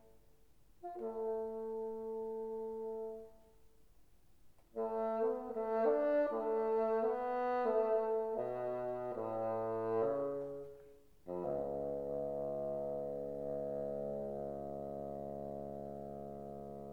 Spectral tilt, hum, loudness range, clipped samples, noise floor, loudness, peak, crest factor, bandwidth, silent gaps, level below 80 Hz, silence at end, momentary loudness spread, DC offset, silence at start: -8.5 dB/octave; none; 9 LU; under 0.1%; -69 dBFS; -39 LUFS; -24 dBFS; 16 dB; 5 kHz; none; -68 dBFS; 0 s; 13 LU; under 0.1%; 0.05 s